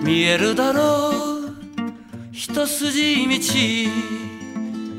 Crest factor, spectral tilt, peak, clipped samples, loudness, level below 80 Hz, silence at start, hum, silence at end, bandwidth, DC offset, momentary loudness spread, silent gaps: 16 dB; -3.5 dB/octave; -4 dBFS; under 0.1%; -20 LUFS; -60 dBFS; 0 s; none; 0 s; 16 kHz; under 0.1%; 14 LU; none